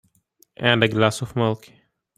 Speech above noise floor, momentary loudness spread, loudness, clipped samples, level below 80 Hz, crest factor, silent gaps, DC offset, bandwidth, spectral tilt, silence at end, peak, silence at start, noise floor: 41 dB; 7 LU; -21 LUFS; under 0.1%; -58 dBFS; 22 dB; none; under 0.1%; 14.5 kHz; -5 dB/octave; 0.6 s; 0 dBFS; 0.6 s; -61 dBFS